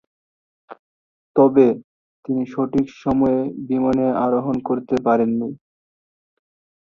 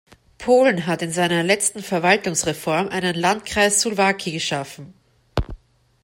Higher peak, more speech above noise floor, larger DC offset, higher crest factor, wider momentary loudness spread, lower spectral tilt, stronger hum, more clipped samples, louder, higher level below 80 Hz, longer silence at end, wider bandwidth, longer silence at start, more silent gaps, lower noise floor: about the same, -2 dBFS vs -4 dBFS; first, over 72 dB vs 25 dB; neither; about the same, 18 dB vs 18 dB; about the same, 10 LU vs 12 LU; first, -9 dB/octave vs -3.5 dB/octave; neither; neither; about the same, -19 LUFS vs -20 LUFS; second, -52 dBFS vs -42 dBFS; first, 1.25 s vs 0.45 s; second, 6.8 kHz vs 16.5 kHz; first, 0.7 s vs 0.4 s; first, 0.79-1.34 s, 1.84-2.23 s vs none; first, under -90 dBFS vs -45 dBFS